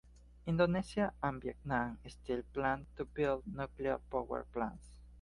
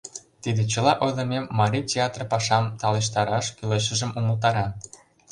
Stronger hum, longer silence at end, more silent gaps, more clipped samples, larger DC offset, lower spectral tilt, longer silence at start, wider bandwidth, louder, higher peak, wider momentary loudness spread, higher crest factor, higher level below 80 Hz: neither; second, 0 s vs 0.35 s; neither; neither; neither; first, -7.5 dB/octave vs -4.5 dB/octave; about the same, 0.05 s vs 0.05 s; about the same, 11.5 kHz vs 11 kHz; second, -38 LUFS vs -24 LUFS; second, -18 dBFS vs -4 dBFS; first, 11 LU vs 7 LU; about the same, 18 dB vs 20 dB; about the same, -54 dBFS vs -54 dBFS